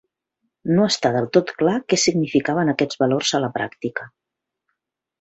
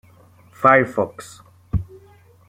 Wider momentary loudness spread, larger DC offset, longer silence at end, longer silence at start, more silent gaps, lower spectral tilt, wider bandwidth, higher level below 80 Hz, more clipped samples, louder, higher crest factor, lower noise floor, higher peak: second, 9 LU vs 25 LU; neither; first, 1.15 s vs 0.65 s; about the same, 0.65 s vs 0.6 s; neither; second, -4.5 dB/octave vs -7 dB/octave; second, 8.4 kHz vs 16 kHz; second, -60 dBFS vs -40 dBFS; neither; about the same, -20 LUFS vs -19 LUFS; about the same, 18 dB vs 20 dB; first, -78 dBFS vs -50 dBFS; about the same, -2 dBFS vs -2 dBFS